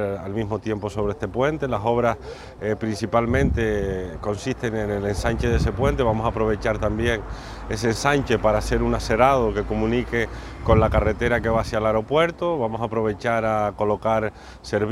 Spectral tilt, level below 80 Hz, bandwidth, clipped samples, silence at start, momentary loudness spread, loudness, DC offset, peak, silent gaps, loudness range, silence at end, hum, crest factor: -6.5 dB/octave; -34 dBFS; 14 kHz; under 0.1%; 0 s; 8 LU; -23 LUFS; under 0.1%; -2 dBFS; none; 3 LU; 0 s; none; 20 dB